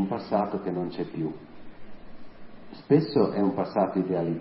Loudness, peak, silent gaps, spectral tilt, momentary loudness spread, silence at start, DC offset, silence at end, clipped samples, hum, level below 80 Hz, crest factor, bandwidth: -27 LUFS; -8 dBFS; none; -12 dB/octave; 11 LU; 0 s; under 0.1%; 0 s; under 0.1%; none; -56 dBFS; 20 dB; 5.8 kHz